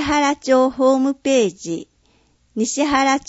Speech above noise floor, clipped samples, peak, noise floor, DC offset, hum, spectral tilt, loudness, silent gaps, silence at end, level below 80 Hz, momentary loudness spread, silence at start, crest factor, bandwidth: 41 dB; under 0.1%; -4 dBFS; -59 dBFS; under 0.1%; none; -3.5 dB/octave; -18 LUFS; none; 0.1 s; -48 dBFS; 12 LU; 0 s; 16 dB; 8 kHz